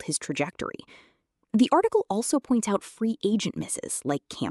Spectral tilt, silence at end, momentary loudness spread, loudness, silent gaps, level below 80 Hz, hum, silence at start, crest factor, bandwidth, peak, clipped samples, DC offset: -4.5 dB/octave; 0 s; 9 LU; -27 LUFS; none; -64 dBFS; none; 0 s; 18 dB; 13.5 kHz; -10 dBFS; under 0.1%; under 0.1%